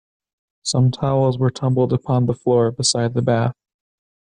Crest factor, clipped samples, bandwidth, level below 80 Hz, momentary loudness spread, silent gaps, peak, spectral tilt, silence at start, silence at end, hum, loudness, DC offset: 14 dB; under 0.1%; 10.5 kHz; -52 dBFS; 3 LU; none; -4 dBFS; -5.5 dB/octave; 0.65 s; 0.75 s; none; -19 LUFS; under 0.1%